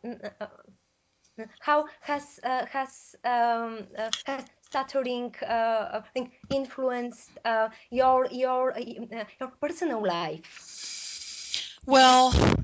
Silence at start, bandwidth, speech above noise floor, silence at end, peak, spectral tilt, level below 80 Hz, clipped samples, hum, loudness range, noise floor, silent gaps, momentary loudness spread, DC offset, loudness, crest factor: 0.05 s; 8 kHz; 45 dB; 0 s; -8 dBFS; -4 dB/octave; -44 dBFS; under 0.1%; none; 5 LU; -71 dBFS; none; 16 LU; under 0.1%; -27 LUFS; 20 dB